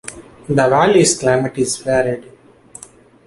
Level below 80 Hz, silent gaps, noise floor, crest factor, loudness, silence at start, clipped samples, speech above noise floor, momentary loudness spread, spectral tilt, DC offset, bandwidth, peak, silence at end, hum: -48 dBFS; none; -43 dBFS; 16 dB; -15 LUFS; 0.05 s; under 0.1%; 28 dB; 16 LU; -4.5 dB/octave; under 0.1%; 11.5 kHz; -2 dBFS; 1.05 s; none